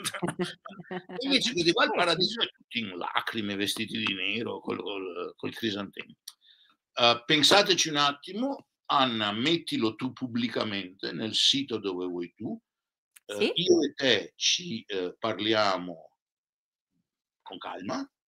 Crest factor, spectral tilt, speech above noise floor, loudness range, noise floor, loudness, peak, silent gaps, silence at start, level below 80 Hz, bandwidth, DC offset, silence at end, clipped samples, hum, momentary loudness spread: 24 dB; -3 dB/octave; over 62 dB; 7 LU; under -90 dBFS; -27 LUFS; -4 dBFS; 2.64-2.68 s, 12.98-13.11 s, 16.21-16.73 s, 16.81-16.87 s; 0 s; -72 dBFS; 16 kHz; under 0.1%; 0.2 s; under 0.1%; none; 16 LU